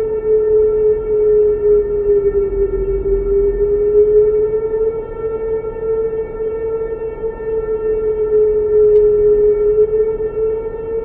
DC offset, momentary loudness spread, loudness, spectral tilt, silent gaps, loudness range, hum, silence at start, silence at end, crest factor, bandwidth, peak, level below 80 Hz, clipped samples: under 0.1%; 10 LU; -15 LUFS; -12.5 dB/octave; none; 6 LU; none; 0 s; 0 s; 12 dB; 2.8 kHz; -2 dBFS; -30 dBFS; under 0.1%